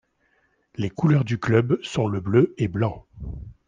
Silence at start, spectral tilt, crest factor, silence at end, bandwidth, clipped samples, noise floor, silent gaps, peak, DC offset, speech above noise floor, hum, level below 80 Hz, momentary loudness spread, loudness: 0.8 s; -8 dB/octave; 18 dB; 0.15 s; 9.4 kHz; under 0.1%; -66 dBFS; none; -6 dBFS; under 0.1%; 44 dB; none; -46 dBFS; 17 LU; -23 LUFS